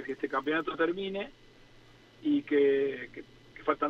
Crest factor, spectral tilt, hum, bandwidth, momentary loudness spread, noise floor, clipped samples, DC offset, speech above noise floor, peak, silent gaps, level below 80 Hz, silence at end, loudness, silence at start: 18 dB; -6.5 dB/octave; none; 6.6 kHz; 17 LU; -57 dBFS; under 0.1%; under 0.1%; 27 dB; -12 dBFS; none; -64 dBFS; 0 s; -31 LUFS; 0 s